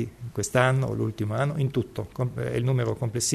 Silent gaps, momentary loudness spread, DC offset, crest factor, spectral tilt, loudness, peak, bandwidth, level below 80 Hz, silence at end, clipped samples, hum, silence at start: none; 8 LU; under 0.1%; 20 dB; -5.5 dB/octave; -27 LUFS; -6 dBFS; 13.5 kHz; -52 dBFS; 0 s; under 0.1%; none; 0 s